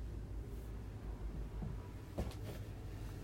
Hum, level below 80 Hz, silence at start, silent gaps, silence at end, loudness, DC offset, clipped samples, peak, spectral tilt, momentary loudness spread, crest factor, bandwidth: none; -48 dBFS; 0 s; none; 0 s; -48 LUFS; under 0.1%; under 0.1%; -28 dBFS; -7 dB/octave; 3 LU; 18 dB; 16 kHz